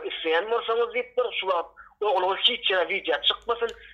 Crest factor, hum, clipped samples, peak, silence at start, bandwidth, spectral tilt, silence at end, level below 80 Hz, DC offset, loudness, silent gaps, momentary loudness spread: 18 dB; none; under 0.1%; -8 dBFS; 0 s; 7.6 kHz; -2.5 dB/octave; 0 s; -62 dBFS; under 0.1%; -25 LUFS; none; 8 LU